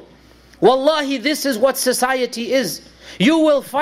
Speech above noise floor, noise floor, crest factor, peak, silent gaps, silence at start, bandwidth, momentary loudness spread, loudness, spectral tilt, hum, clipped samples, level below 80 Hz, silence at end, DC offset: 30 dB; -47 dBFS; 14 dB; -2 dBFS; none; 0.6 s; 16 kHz; 6 LU; -17 LUFS; -3.5 dB/octave; none; under 0.1%; -56 dBFS; 0 s; under 0.1%